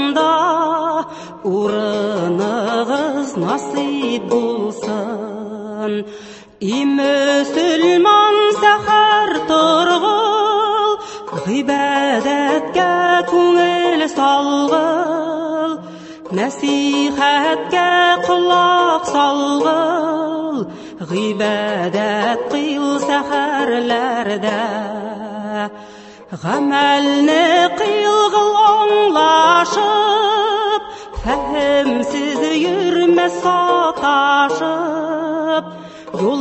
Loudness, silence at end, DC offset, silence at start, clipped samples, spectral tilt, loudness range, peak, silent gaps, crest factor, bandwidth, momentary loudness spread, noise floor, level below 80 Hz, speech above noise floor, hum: -15 LUFS; 0 s; under 0.1%; 0 s; under 0.1%; -4 dB/octave; 7 LU; 0 dBFS; none; 16 dB; 8.6 kHz; 12 LU; -38 dBFS; -48 dBFS; 23 dB; none